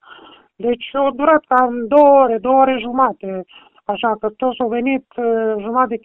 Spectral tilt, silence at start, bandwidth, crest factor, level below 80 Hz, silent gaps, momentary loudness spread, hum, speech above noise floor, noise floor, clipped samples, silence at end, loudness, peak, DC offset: -8 dB/octave; 0.1 s; 4 kHz; 16 dB; -56 dBFS; none; 12 LU; none; 27 dB; -43 dBFS; under 0.1%; 0.05 s; -16 LUFS; 0 dBFS; under 0.1%